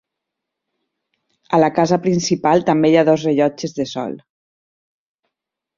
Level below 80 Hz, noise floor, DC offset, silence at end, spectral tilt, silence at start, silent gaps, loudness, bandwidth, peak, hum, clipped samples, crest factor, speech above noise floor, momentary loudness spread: -60 dBFS; -81 dBFS; under 0.1%; 1.6 s; -6 dB/octave; 1.5 s; none; -16 LUFS; 7.6 kHz; 0 dBFS; none; under 0.1%; 18 dB; 65 dB; 11 LU